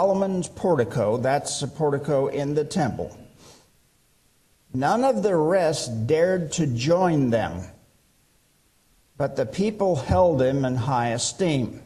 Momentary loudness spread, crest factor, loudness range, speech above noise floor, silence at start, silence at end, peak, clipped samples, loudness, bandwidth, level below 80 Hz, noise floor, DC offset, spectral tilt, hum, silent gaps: 7 LU; 16 dB; 5 LU; 40 dB; 0 s; 0.05 s; -8 dBFS; under 0.1%; -23 LUFS; 13 kHz; -50 dBFS; -63 dBFS; under 0.1%; -5.5 dB/octave; none; none